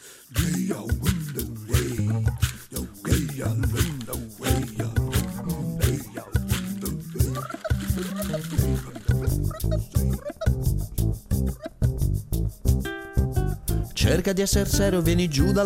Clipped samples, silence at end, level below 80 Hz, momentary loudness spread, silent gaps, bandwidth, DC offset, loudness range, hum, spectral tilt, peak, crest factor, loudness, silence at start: under 0.1%; 0 s; -32 dBFS; 8 LU; none; 17 kHz; under 0.1%; 3 LU; none; -5.5 dB/octave; -8 dBFS; 18 dB; -26 LUFS; 0 s